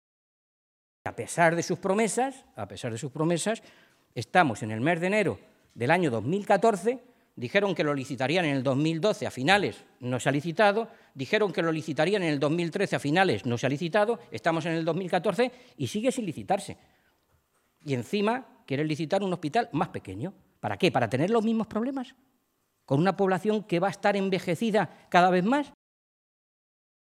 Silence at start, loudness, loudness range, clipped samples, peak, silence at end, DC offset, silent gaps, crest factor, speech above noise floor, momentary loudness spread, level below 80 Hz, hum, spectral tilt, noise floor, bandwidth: 1.05 s; -27 LUFS; 4 LU; under 0.1%; -4 dBFS; 1.45 s; under 0.1%; none; 24 dB; 47 dB; 13 LU; -70 dBFS; none; -5.5 dB/octave; -74 dBFS; 15 kHz